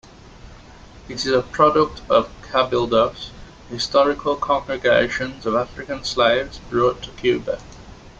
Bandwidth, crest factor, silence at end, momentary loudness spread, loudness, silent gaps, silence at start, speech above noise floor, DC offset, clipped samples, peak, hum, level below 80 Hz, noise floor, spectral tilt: 8.8 kHz; 18 dB; 0.1 s; 11 LU; -20 LUFS; none; 0.45 s; 23 dB; under 0.1%; under 0.1%; -2 dBFS; none; -44 dBFS; -43 dBFS; -4.5 dB/octave